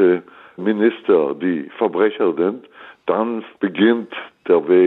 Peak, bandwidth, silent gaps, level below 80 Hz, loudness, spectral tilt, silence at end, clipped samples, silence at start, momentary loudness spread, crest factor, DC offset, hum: -4 dBFS; 4.1 kHz; none; -72 dBFS; -19 LUFS; -9 dB/octave; 0 s; under 0.1%; 0 s; 9 LU; 14 dB; under 0.1%; none